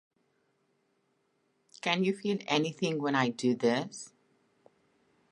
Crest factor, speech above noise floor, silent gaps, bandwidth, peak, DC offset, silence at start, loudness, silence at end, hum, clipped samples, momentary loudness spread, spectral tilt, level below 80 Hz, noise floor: 24 dB; 45 dB; none; 11 kHz; -10 dBFS; under 0.1%; 1.85 s; -30 LUFS; 1.25 s; none; under 0.1%; 11 LU; -5 dB/octave; -82 dBFS; -75 dBFS